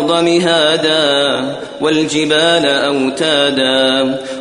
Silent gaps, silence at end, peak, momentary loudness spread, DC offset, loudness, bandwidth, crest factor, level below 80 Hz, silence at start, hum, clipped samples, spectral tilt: none; 0 s; 0 dBFS; 5 LU; under 0.1%; -12 LUFS; 11 kHz; 14 dB; -54 dBFS; 0 s; none; under 0.1%; -3.5 dB/octave